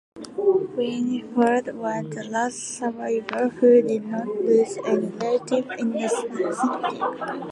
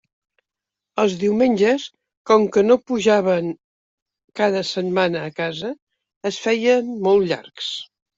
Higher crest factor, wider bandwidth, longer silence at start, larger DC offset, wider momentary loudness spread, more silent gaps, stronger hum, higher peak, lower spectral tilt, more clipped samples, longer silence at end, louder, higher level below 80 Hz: about the same, 18 dB vs 18 dB; first, 11.5 kHz vs 7.8 kHz; second, 0.15 s vs 0.95 s; neither; second, 9 LU vs 14 LU; second, none vs 2.17-2.25 s, 3.64-4.06 s, 4.24-4.28 s, 5.82-5.87 s, 6.16-6.21 s; neither; about the same, -6 dBFS vs -4 dBFS; about the same, -5 dB/octave vs -5 dB/octave; neither; second, 0 s vs 0.35 s; second, -23 LUFS vs -20 LUFS; second, -70 dBFS vs -64 dBFS